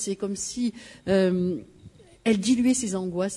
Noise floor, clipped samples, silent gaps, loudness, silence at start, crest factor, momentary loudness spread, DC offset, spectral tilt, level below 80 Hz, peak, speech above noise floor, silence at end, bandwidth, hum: -50 dBFS; under 0.1%; none; -25 LUFS; 0 s; 16 dB; 9 LU; under 0.1%; -5 dB/octave; -58 dBFS; -10 dBFS; 26 dB; 0 s; 12 kHz; none